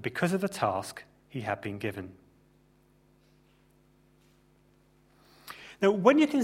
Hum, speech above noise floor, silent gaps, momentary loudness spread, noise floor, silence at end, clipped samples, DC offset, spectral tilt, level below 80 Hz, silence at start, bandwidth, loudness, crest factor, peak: none; 36 dB; none; 25 LU; -64 dBFS; 0 s; under 0.1%; under 0.1%; -6 dB/octave; -68 dBFS; 0 s; 16 kHz; -28 LUFS; 26 dB; -6 dBFS